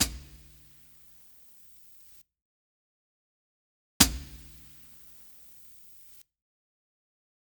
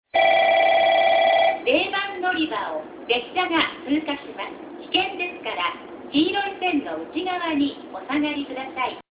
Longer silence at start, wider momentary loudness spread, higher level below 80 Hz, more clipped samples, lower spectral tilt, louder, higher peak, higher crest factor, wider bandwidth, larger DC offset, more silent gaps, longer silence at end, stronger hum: second, 0 s vs 0.15 s; first, 29 LU vs 13 LU; first, -48 dBFS vs -60 dBFS; neither; second, -1.5 dB/octave vs -7 dB/octave; second, -25 LUFS vs -22 LUFS; first, 0 dBFS vs -6 dBFS; first, 36 dB vs 16 dB; first, over 20 kHz vs 4 kHz; neither; first, 2.42-4.00 s vs none; first, 3.05 s vs 0.1 s; neither